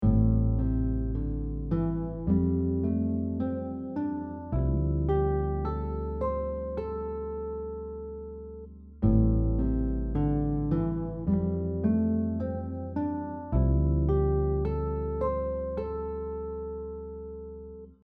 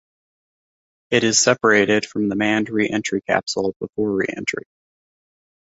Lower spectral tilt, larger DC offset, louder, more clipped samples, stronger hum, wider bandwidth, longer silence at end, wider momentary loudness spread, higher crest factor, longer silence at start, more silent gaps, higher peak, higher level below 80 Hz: first, -13 dB/octave vs -3 dB/octave; neither; second, -30 LUFS vs -19 LUFS; neither; neither; second, 4.2 kHz vs 8 kHz; second, 0.15 s vs 1 s; about the same, 12 LU vs 10 LU; about the same, 18 dB vs 20 dB; second, 0 s vs 1.1 s; second, none vs 3.76-3.80 s; second, -10 dBFS vs -2 dBFS; first, -34 dBFS vs -58 dBFS